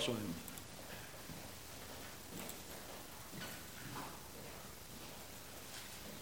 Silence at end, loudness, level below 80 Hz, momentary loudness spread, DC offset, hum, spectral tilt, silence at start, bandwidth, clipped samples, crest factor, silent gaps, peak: 0 s; -49 LUFS; -66 dBFS; 3 LU; 0.1%; none; -3 dB/octave; 0 s; 17 kHz; under 0.1%; 24 dB; none; -26 dBFS